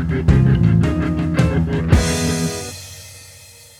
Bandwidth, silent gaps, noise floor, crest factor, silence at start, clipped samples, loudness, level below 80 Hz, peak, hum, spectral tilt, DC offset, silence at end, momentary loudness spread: 14.5 kHz; none; -42 dBFS; 16 dB; 0 s; under 0.1%; -17 LUFS; -26 dBFS; 0 dBFS; none; -6 dB/octave; under 0.1%; 0.4 s; 20 LU